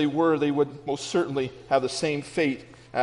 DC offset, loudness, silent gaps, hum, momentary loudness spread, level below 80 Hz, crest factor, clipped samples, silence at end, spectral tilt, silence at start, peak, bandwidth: under 0.1%; -26 LUFS; none; none; 8 LU; -62 dBFS; 16 dB; under 0.1%; 0 s; -5 dB/octave; 0 s; -10 dBFS; 10.5 kHz